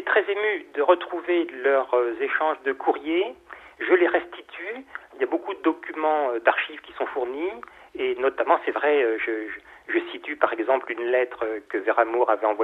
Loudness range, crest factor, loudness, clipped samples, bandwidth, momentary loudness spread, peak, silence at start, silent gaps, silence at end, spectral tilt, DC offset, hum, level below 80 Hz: 3 LU; 20 dB; -24 LUFS; under 0.1%; 4.1 kHz; 12 LU; -4 dBFS; 0 s; none; 0 s; -5 dB/octave; under 0.1%; none; -68 dBFS